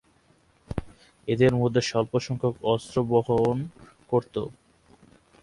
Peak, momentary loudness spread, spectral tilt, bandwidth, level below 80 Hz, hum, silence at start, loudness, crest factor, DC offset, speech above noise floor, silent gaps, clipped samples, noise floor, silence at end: -8 dBFS; 15 LU; -6.5 dB/octave; 11.5 kHz; -52 dBFS; none; 0.7 s; -26 LUFS; 20 dB; under 0.1%; 38 dB; none; under 0.1%; -62 dBFS; 0.9 s